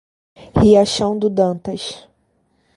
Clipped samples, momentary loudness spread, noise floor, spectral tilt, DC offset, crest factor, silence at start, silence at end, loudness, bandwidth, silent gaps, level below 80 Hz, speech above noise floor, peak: under 0.1%; 16 LU; -63 dBFS; -6 dB/octave; under 0.1%; 18 dB; 0.4 s; 0.8 s; -16 LUFS; 11.5 kHz; none; -38 dBFS; 47 dB; 0 dBFS